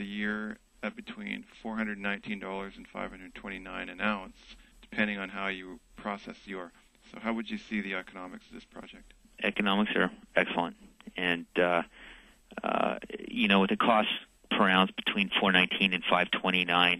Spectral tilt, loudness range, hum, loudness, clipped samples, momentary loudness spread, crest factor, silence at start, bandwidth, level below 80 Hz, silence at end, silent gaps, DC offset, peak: -5.5 dB/octave; 11 LU; none; -30 LUFS; under 0.1%; 19 LU; 24 dB; 0 s; 12 kHz; -62 dBFS; 0 s; none; under 0.1%; -8 dBFS